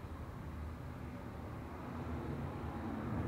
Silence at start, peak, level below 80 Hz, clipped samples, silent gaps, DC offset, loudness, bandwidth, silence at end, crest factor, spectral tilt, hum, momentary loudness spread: 0 s; -28 dBFS; -52 dBFS; under 0.1%; none; under 0.1%; -45 LUFS; 16 kHz; 0 s; 14 dB; -8 dB/octave; none; 5 LU